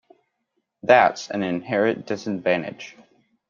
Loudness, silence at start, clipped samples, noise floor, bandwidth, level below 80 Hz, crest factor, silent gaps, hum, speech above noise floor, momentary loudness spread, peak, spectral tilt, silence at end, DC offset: -21 LUFS; 0.85 s; under 0.1%; -75 dBFS; 7.4 kHz; -66 dBFS; 22 dB; none; none; 54 dB; 18 LU; -2 dBFS; -5.5 dB/octave; 0.6 s; under 0.1%